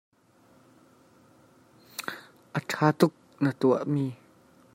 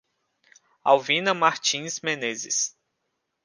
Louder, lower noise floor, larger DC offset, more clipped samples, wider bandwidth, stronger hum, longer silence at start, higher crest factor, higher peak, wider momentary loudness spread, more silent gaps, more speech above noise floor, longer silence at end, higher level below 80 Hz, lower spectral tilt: second, -28 LUFS vs -23 LUFS; second, -61 dBFS vs -78 dBFS; neither; neither; first, 16 kHz vs 10.5 kHz; neither; first, 2 s vs 0.85 s; about the same, 24 dB vs 22 dB; about the same, -6 dBFS vs -4 dBFS; first, 16 LU vs 8 LU; neither; second, 36 dB vs 54 dB; second, 0.6 s vs 0.75 s; first, -72 dBFS vs -80 dBFS; first, -6.5 dB/octave vs -1.5 dB/octave